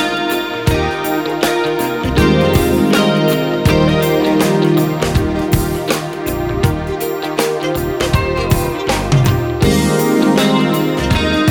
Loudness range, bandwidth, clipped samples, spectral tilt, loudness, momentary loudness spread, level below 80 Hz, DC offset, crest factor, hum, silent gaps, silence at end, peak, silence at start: 4 LU; 18 kHz; under 0.1%; -5.5 dB/octave; -15 LUFS; 6 LU; -28 dBFS; under 0.1%; 14 dB; none; none; 0 s; 0 dBFS; 0 s